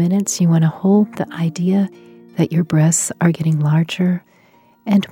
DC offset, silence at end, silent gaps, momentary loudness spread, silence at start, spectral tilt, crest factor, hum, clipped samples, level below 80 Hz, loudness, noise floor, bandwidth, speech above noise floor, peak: under 0.1%; 0.05 s; none; 7 LU; 0 s; -6 dB/octave; 16 dB; none; under 0.1%; -62 dBFS; -17 LUFS; -52 dBFS; 16 kHz; 36 dB; -2 dBFS